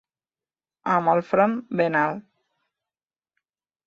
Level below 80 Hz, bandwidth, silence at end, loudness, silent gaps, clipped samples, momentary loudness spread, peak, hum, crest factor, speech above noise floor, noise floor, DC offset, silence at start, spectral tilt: -72 dBFS; 7.2 kHz; 1.65 s; -22 LUFS; none; under 0.1%; 9 LU; -6 dBFS; none; 20 dB; over 68 dB; under -90 dBFS; under 0.1%; 0.85 s; -8 dB/octave